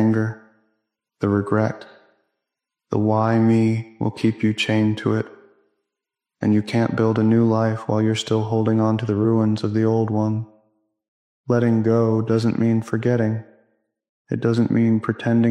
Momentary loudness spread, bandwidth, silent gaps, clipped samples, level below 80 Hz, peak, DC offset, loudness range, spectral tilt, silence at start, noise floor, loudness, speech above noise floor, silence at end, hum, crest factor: 8 LU; 10 kHz; 11.08-11.44 s, 14.09-14.25 s; under 0.1%; -62 dBFS; -6 dBFS; under 0.1%; 3 LU; -7.5 dB/octave; 0 s; -85 dBFS; -20 LUFS; 67 dB; 0 s; none; 14 dB